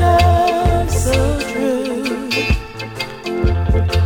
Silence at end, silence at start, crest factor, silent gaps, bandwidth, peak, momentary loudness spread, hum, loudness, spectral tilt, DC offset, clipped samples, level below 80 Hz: 0 s; 0 s; 14 dB; none; 17.5 kHz; 0 dBFS; 10 LU; none; -17 LUFS; -5.5 dB/octave; under 0.1%; under 0.1%; -22 dBFS